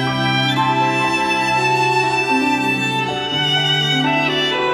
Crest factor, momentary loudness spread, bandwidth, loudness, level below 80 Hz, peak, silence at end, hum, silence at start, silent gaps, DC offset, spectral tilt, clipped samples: 12 dB; 3 LU; 16 kHz; -16 LUFS; -52 dBFS; -6 dBFS; 0 s; none; 0 s; none; under 0.1%; -4 dB/octave; under 0.1%